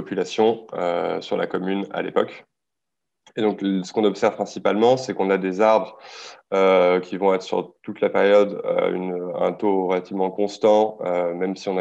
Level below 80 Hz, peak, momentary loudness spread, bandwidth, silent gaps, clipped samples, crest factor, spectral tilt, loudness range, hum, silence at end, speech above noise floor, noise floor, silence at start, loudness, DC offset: -72 dBFS; -4 dBFS; 9 LU; 8.2 kHz; none; under 0.1%; 16 dB; -6 dB/octave; 5 LU; none; 0 s; 64 dB; -85 dBFS; 0 s; -21 LUFS; under 0.1%